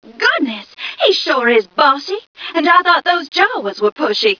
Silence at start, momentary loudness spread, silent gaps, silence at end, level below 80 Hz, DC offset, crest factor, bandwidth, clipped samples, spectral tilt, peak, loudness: 0.05 s; 11 LU; 2.27-2.35 s, 3.92-3.96 s; 0.05 s; -66 dBFS; under 0.1%; 14 dB; 5.4 kHz; under 0.1%; -3 dB/octave; 0 dBFS; -14 LUFS